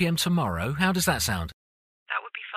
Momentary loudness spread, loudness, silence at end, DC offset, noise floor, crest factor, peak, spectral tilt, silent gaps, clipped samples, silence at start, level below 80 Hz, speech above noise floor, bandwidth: 9 LU; -26 LUFS; 0 s; under 0.1%; under -90 dBFS; 18 dB; -8 dBFS; -4 dB/octave; 1.53-2.06 s; under 0.1%; 0 s; -46 dBFS; over 65 dB; 15.5 kHz